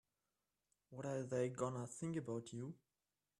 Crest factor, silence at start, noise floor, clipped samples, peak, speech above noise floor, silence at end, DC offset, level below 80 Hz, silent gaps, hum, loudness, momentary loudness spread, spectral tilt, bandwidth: 20 dB; 0.9 s; under -90 dBFS; under 0.1%; -26 dBFS; over 46 dB; 0.65 s; under 0.1%; -82 dBFS; none; none; -45 LUFS; 12 LU; -6.5 dB/octave; 11.5 kHz